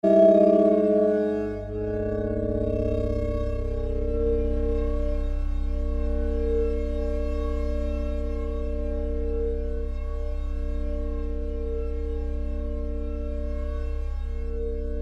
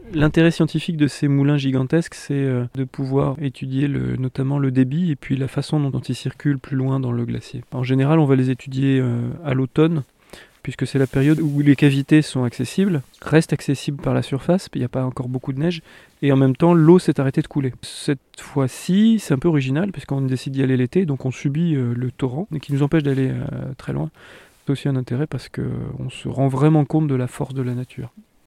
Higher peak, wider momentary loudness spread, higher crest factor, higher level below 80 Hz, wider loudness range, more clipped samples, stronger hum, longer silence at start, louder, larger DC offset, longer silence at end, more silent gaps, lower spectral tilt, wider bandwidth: second, -6 dBFS vs 0 dBFS; about the same, 11 LU vs 11 LU; about the same, 18 dB vs 20 dB; first, -28 dBFS vs -48 dBFS; first, 7 LU vs 4 LU; neither; neither; about the same, 0.05 s vs 0 s; second, -27 LUFS vs -20 LUFS; neither; second, 0 s vs 0.4 s; neither; first, -9.5 dB/octave vs -7.5 dB/octave; second, 5.6 kHz vs 12.5 kHz